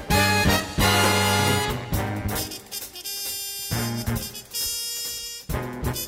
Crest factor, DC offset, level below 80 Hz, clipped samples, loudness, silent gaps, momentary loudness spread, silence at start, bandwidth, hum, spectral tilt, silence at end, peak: 18 dB; under 0.1%; -38 dBFS; under 0.1%; -24 LUFS; none; 12 LU; 0 s; 16.5 kHz; none; -3.5 dB/octave; 0 s; -6 dBFS